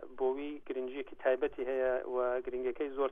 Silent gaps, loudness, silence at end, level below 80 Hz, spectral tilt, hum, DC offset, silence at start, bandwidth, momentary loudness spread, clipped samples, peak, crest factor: none; -35 LUFS; 0 s; -62 dBFS; -7 dB/octave; none; under 0.1%; 0 s; 3.7 kHz; 7 LU; under 0.1%; -18 dBFS; 16 dB